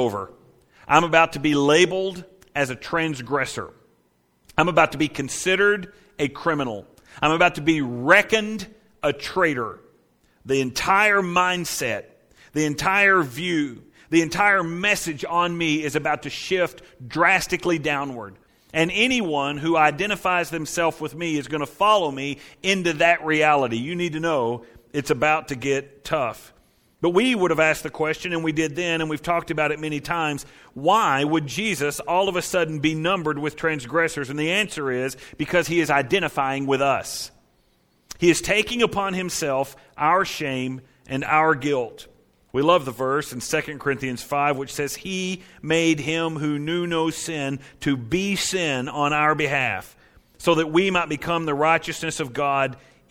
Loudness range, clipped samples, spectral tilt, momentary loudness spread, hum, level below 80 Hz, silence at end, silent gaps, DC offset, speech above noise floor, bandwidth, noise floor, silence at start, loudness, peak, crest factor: 3 LU; under 0.1%; -4 dB/octave; 11 LU; none; -52 dBFS; 0.35 s; none; under 0.1%; 42 dB; 17.5 kHz; -64 dBFS; 0 s; -22 LUFS; 0 dBFS; 22 dB